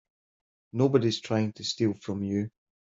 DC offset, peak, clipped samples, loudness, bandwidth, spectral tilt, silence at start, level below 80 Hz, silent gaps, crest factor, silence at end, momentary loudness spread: under 0.1%; -10 dBFS; under 0.1%; -28 LUFS; 7.8 kHz; -6 dB/octave; 0.75 s; -68 dBFS; none; 20 dB; 0.5 s; 9 LU